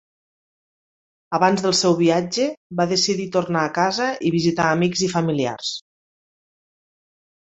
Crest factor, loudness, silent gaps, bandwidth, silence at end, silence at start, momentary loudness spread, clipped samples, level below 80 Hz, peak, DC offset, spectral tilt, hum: 20 dB; -20 LUFS; 2.57-2.70 s; 8.2 kHz; 1.65 s; 1.3 s; 7 LU; under 0.1%; -60 dBFS; -2 dBFS; under 0.1%; -4.5 dB/octave; none